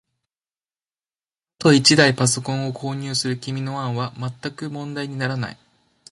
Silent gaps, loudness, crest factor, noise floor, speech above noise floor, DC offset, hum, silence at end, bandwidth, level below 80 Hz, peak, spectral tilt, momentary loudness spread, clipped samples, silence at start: none; -20 LUFS; 22 dB; under -90 dBFS; over 69 dB; under 0.1%; none; 0.6 s; 11.5 kHz; -60 dBFS; 0 dBFS; -4 dB/octave; 16 LU; under 0.1%; 1.6 s